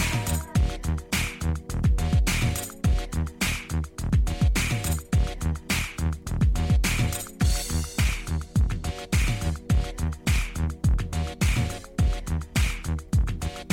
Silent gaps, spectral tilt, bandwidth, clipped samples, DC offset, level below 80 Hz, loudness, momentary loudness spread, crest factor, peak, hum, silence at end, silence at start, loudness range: none; -4.5 dB/octave; 17 kHz; under 0.1%; under 0.1%; -28 dBFS; -27 LUFS; 7 LU; 14 dB; -12 dBFS; none; 0 s; 0 s; 1 LU